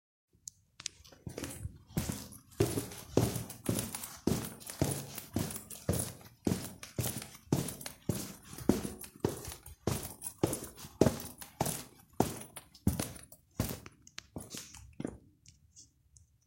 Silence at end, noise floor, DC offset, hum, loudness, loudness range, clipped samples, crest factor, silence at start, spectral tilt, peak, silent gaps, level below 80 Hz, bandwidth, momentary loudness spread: 0.6 s; -65 dBFS; under 0.1%; none; -37 LUFS; 4 LU; under 0.1%; 30 dB; 0.8 s; -5 dB/octave; -8 dBFS; none; -56 dBFS; 16.5 kHz; 15 LU